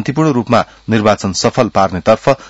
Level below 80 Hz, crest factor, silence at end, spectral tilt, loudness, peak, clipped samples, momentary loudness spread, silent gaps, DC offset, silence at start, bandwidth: -44 dBFS; 14 dB; 0 s; -5.5 dB/octave; -13 LUFS; 0 dBFS; 0.3%; 2 LU; none; under 0.1%; 0 s; 8 kHz